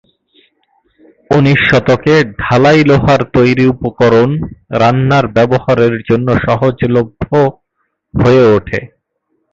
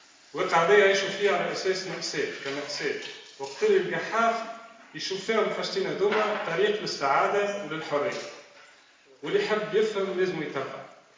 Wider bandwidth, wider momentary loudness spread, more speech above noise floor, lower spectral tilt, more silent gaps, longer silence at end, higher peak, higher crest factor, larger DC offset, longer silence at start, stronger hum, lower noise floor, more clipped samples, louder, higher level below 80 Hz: about the same, 7.6 kHz vs 7.6 kHz; second, 6 LU vs 15 LU; first, 57 dB vs 30 dB; first, -7.5 dB/octave vs -3.5 dB/octave; neither; first, 0.7 s vs 0.25 s; first, 0 dBFS vs -6 dBFS; second, 12 dB vs 20 dB; neither; first, 1.3 s vs 0.35 s; neither; first, -66 dBFS vs -57 dBFS; neither; first, -11 LUFS vs -26 LUFS; first, -36 dBFS vs -78 dBFS